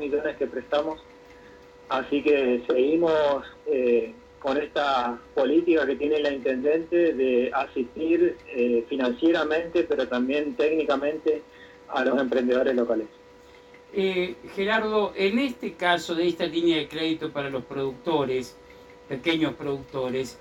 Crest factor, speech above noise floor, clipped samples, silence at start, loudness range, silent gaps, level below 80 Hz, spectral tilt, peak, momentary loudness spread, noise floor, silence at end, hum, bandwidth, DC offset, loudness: 18 dB; 26 dB; under 0.1%; 0 s; 3 LU; none; -58 dBFS; -5.5 dB/octave; -8 dBFS; 8 LU; -50 dBFS; 0.05 s; none; 11 kHz; under 0.1%; -25 LUFS